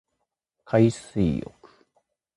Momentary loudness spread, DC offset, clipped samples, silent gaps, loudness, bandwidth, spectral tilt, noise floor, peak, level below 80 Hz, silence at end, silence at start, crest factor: 12 LU; under 0.1%; under 0.1%; none; -24 LUFS; 11.5 kHz; -7.5 dB/octave; -80 dBFS; -8 dBFS; -48 dBFS; 0.95 s; 0.7 s; 20 dB